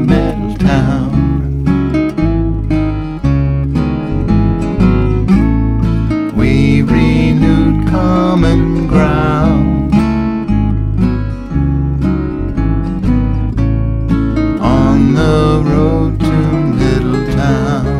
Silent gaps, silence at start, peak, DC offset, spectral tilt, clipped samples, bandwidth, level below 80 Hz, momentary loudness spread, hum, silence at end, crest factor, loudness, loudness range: none; 0 s; 0 dBFS; under 0.1%; -8.5 dB/octave; under 0.1%; 10.5 kHz; -18 dBFS; 5 LU; none; 0 s; 12 dB; -13 LUFS; 4 LU